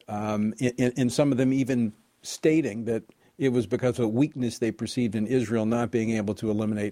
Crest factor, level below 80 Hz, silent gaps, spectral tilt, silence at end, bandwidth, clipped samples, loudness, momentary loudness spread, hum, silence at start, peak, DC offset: 18 dB; -60 dBFS; none; -6.5 dB/octave; 0 s; 15.5 kHz; under 0.1%; -26 LUFS; 6 LU; none; 0.1 s; -8 dBFS; under 0.1%